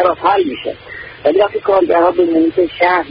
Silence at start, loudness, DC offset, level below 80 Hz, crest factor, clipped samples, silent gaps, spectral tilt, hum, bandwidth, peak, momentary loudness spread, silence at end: 0 s; -13 LUFS; under 0.1%; -48 dBFS; 12 dB; under 0.1%; none; -10.5 dB/octave; none; 5.2 kHz; 0 dBFS; 13 LU; 0 s